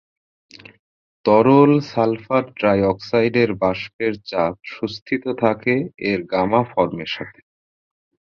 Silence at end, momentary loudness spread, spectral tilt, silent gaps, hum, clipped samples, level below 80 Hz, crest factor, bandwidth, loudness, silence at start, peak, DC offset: 1.05 s; 12 LU; -8 dB/octave; 3.93-3.99 s, 5.02-5.06 s; none; under 0.1%; -52 dBFS; 18 dB; 6.8 kHz; -19 LUFS; 1.25 s; -2 dBFS; under 0.1%